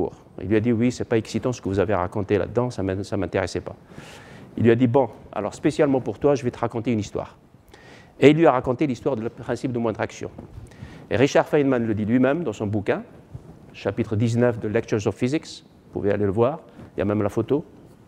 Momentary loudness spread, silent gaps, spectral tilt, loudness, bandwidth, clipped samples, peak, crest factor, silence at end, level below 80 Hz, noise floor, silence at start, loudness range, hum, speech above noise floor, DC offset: 21 LU; none; -7 dB/octave; -23 LUFS; 11.5 kHz; under 0.1%; 0 dBFS; 22 dB; 0.45 s; -52 dBFS; -49 dBFS; 0 s; 3 LU; none; 27 dB; under 0.1%